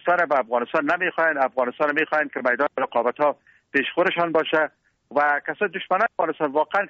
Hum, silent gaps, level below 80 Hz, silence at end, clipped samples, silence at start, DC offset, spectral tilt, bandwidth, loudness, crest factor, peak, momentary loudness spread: none; none; -70 dBFS; 0 s; under 0.1%; 0.05 s; under 0.1%; -1.5 dB/octave; 7.2 kHz; -22 LUFS; 16 dB; -6 dBFS; 4 LU